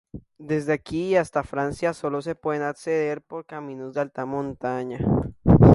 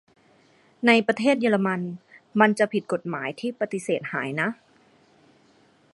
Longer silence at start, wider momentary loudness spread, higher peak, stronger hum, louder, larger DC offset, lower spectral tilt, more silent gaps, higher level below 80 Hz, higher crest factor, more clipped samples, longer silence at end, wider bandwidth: second, 0.15 s vs 0.8 s; about the same, 12 LU vs 11 LU; about the same, 0 dBFS vs -2 dBFS; neither; about the same, -25 LUFS vs -24 LUFS; neither; first, -8.5 dB/octave vs -5.5 dB/octave; neither; first, -38 dBFS vs -74 dBFS; about the same, 22 dB vs 24 dB; neither; second, 0 s vs 1.4 s; about the same, 11.5 kHz vs 11.5 kHz